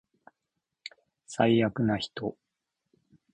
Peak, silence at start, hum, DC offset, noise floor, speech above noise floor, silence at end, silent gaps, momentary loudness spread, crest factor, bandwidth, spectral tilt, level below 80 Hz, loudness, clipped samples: -10 dBFS; 0.85 s; none; under 0.1%; -85 dBFS; 58 dB; 1 s; none; 22 LU; 22 dB; 9.8 kHz; -6 dB/octave; -64 dBFS; -28 LUFS; under 0.1%